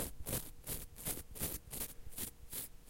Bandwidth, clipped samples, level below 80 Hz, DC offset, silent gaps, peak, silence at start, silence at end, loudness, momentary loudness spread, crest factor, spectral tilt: 17 kHz; under 0.1%; -54 dBFS; under 0.1%; none; -22 dBFS; 0 s; 0 s; -43 LUFS; 4 LU; 22 dB; -3 dB/octave